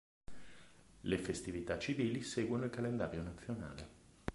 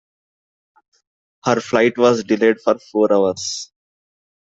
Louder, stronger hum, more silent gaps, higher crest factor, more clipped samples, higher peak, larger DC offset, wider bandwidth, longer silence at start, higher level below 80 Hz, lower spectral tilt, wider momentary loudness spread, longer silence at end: second, -40 LUFS vs -17 LUFS; neither; neither; about the same, 22 dB vs 20 dB; neither; second, -20 dBFS vs 0 dBFS; neither; first, 11.5 kHz vs 8 kHz; second, 0.3 s vs 1.45 s; about the same, -58 dBFS vs -62 dBFS; about the same, -5.5 dB/octave vs -4.5 dB/octave; first, 20 LU vs 11 LU; second, 0 s vs 0.95 s